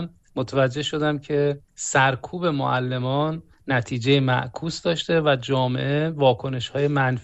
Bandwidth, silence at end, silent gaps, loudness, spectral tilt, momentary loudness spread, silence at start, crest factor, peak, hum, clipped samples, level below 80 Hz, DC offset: 8.4 kHz; 0 s; none; -23 LUFS; -5.5 dB/octave; 7 LU; 0 s; 18 dB; -6 dBFS; none; under 0.1%; -54 dBFS; under 0.1%